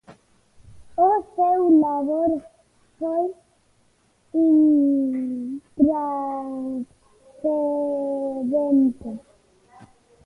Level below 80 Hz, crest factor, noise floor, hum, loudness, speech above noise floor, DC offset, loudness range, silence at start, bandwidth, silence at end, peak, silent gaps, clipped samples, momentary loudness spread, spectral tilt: -60 dBFS; 16 dB; -62 dBFS; none; -22 LUFS; 43 dB; under 0.1%; 3 LU; 0.1 s; 2.6 kHz; 0.4 s; -6 dBFS; none; under 0.1%; 14 LU; -9 dB/octave